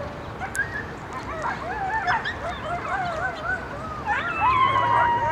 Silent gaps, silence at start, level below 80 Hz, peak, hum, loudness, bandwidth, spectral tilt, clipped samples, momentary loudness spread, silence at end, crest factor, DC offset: none; 0 s; -44 dBFS; -8 dBFS; none; -25 LUFS; 14 kHz; -4.5 dB/octave; under 0.1%; 13 LU; 0 s; 18 dB; under 0.1%